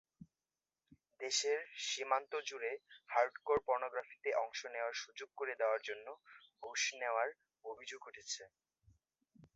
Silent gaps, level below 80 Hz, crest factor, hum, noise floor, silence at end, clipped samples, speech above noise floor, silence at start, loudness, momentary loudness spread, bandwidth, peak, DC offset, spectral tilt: none; -80 dBFS; 24 dB; none; under -90 dBFS; 0.1 s; under 0.1%; over 50 dB; 0.2 s; -40 LUFS; 14 LU; 8 kHz; -18 dBFS; under 0.1%; 1.5 dB/octave